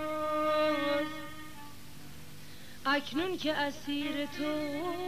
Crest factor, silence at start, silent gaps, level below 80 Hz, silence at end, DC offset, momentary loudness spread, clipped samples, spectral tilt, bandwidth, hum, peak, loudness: 18 dB; 0 s; none; -62 dBFS; 0 s; 0.6%; 20 LU; under 0.1%; -4 dB/octave; 15.5 kHz; none; -16 dBFS; -32 LUFS